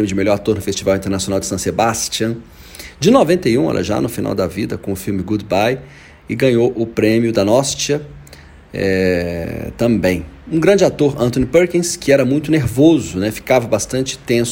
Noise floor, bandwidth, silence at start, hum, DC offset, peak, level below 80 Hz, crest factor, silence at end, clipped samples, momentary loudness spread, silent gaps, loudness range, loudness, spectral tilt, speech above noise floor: -40 dBFS; 16.5 kHz; 0 s; none; under 0.1%; 0 dBFS; -40 dBFS; 16 dB; 0 s; under 0.1%; 10 LU; none; 4 LU; -16 LUFS; -5 dB/octave; 24 dB